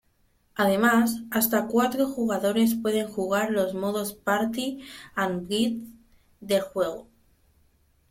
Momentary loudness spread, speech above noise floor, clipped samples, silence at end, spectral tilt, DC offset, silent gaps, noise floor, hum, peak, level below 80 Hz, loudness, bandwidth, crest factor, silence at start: 10 LU; 41 dB; under 0.1%; 1.1 s; -4.5 dB/octave; under 0.1%; none; -66 dBFS; none; -8 dBFS; -62 dBFS; -25 LUFS; 16.5 kHz; 18 dB; 0.55 s